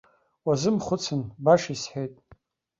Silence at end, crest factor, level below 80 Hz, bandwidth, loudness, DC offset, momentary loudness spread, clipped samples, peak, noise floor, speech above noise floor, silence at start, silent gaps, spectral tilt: 0.45 s; 20 dB; -60 dBFS; 7.8 kHz; -26 LUFS; under 0.1%; 12 LU; under 0.1%; -6 dBFS; -58 dBFS; 33 dB; 0.45 s; none; -5.5 dB/octave